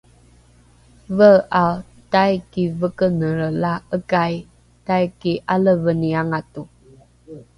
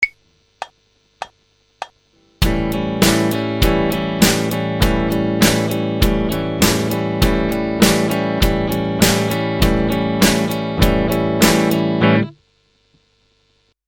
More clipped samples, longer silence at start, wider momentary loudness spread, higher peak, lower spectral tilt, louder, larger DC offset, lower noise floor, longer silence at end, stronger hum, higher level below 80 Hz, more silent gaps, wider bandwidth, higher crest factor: neither; first, 1.1 s vs 0 s; second, 13 LU vs 17 LU; about the same, 0 dBFS vs 0 dBFS; first, -8 dB/octave vs -4.5 dB/octave; second, -19 LUFS vs -16 LUFS; neither; second, -51 dBFS vs -61 dBFS; second, 0.15 s vs 1.55 s; second, none vs 50 Hz at -40 dBFS; second, -50 dBFS vs -28 dBFS; neither; second, 11 kHz vs 18.5 kHz; about the same, 18 dB vs 18 dB